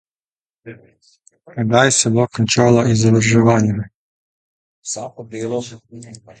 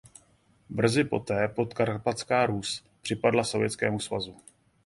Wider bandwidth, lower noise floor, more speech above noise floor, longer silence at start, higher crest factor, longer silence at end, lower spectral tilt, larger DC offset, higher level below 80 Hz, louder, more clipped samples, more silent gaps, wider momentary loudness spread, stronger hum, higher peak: second, 9.4 kHz vs 12 kHz; first, under -90 dBFS vs -64 dBFS; first, over 73 dB vs 36 dB; about the same, 0.65 s vs 0.7 s; about the same, 18 dB vs 22 dB; second, 0.25 s vs 0.55 s; about the same, -5 dB/octave vs -5 dB/octave; neither; first, -50 dBFS vs -60 dBFS; first, -15 LUFS vs -28 LUFS; neither; first, 3.94-4.82 s vs none; first, 20 LU vs 9 LU; neither; first, 0 dBFS vs -6 dBFS